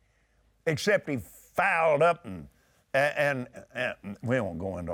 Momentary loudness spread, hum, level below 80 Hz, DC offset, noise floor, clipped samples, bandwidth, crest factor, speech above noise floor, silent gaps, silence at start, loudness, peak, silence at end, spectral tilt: 13 LU; none; -62 dBFS; under 0.1%; -67 dBFS; under 0.1%; 19 kHz; 16 dB; 39 dB; none; 0.65 s; -28 LUFS; -12 dBFS; 0 s; -5.5 dB/octave